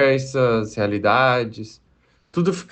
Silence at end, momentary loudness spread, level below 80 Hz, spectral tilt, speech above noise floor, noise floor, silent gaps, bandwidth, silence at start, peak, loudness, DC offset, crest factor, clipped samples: 0.1 s; 13 LU; -56 dBFS; -6 dB/octave; 40 dB; -60 dBFS; none; 8.8 kHz; 0 s; -4 dBFS; -20 LUFS; under 0.1%; 16 dB; under 0.1%